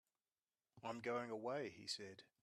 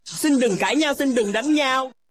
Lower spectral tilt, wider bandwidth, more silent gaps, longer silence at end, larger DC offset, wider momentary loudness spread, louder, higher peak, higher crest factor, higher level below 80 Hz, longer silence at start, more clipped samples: about the same, -4 dB/octave vs -3.5 dB/octave; second, 13 kHz vs 16 kHz; neither; about the same, 0.15 s vs 0.2 s; second, under 0.1% vs 0.1%; first, 8 LU vs 2 LU; second, -48 LUFS vs -20 LUFS; second, -32 dBFS vs -8 dBFS; first, 18 dB vs 12 dB; second, -90 dBFS vs -64 dBFS; first, 0.75 s vs 0.05 s; neither